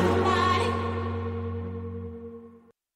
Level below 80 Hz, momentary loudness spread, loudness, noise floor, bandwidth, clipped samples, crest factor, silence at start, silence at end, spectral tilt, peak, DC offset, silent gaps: -50 dBFS; 18 LU; -28 LUFS; -53 dBFS; 12 kHz; under 0.1%; 18 dB; 0 s; 0.4 s; -6.5 dB/octave; -10 dBFS; under 0.1%; none